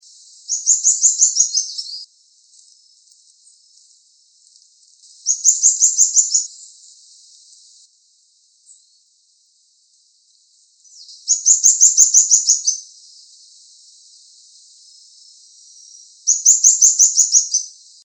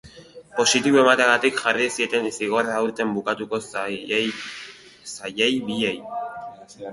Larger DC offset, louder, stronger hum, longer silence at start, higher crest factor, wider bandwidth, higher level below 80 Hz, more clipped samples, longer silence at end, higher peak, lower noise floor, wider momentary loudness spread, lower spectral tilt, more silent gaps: neither; first, -12 LUFS vs -21 LUFS; neither; first, 0.5 s vs 0.05 s; about the same, 20 dB vs 20 dB; first, over 20 kHz vs 11.5 kHz; second, -88 dBFS vs -64 dBFS; neither; first, 0.35 s vs 0 s; about the same, 0 dBFS vs -2 dBFS; first, -58 dBFS vs -45 dBFS; second, 16 LU vs 19 LU; second, 8 dB/octave vs -2.5 dB/octave; neither